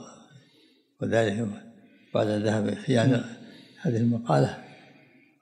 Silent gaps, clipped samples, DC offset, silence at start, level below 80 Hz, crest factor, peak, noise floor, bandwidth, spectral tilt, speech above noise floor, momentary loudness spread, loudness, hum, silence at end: none; under 0.1%; under 0.1%; 0 s; -72 dBFS; 18 dB; -8 dBFS; -62 dBFS; 9.8 kHz; -7 dB/octave; 37 dB; 18 LU; -26 LUFS; none; 0.65 s